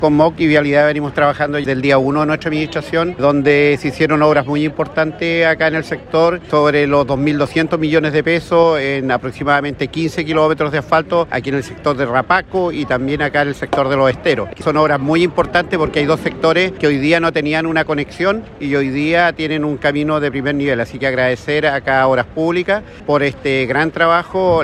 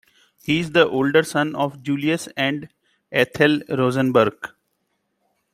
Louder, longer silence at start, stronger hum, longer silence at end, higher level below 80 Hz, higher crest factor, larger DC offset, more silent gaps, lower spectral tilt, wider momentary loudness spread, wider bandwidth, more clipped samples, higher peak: first, -15 LUFS vs -20 LUFS; second, 0 s vs 0.45 s; neither; second, 0 s vs 1.05 s; first, -42 dBFS vs -60 dBFS; second, 14 dB vs 20 dB; neither; neither; about the same, -6.5 dB/octave vs -5.5 dB/octave; about the same, 6 LU vs 8 LU; second, 12 kHz vs 16 kHz; neither; about the same, 0 dBFS vs -2 dBFS